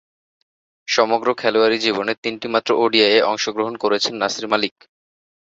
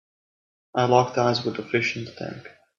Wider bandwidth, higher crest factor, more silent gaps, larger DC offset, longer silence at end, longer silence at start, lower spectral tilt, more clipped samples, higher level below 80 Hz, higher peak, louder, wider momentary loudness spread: about the same, 7.8 kHz vs 7.4 kHz; about the same, 18 dB vs 22 dB; first, 2.18-2.22 s vs none; neither; first, 0.9 s vs 0.3 s; first, 0.9 s vs 0.75 s; second, -3 dB/octave vs -5.5 dB/octave; neither; about the same, -64 dBFS vs -66 dBFS; about the same, -2 dBFS vs -4 dBFS; first, -18 LUFS vs -23 LUFS; second, 8 LU vs 16 LU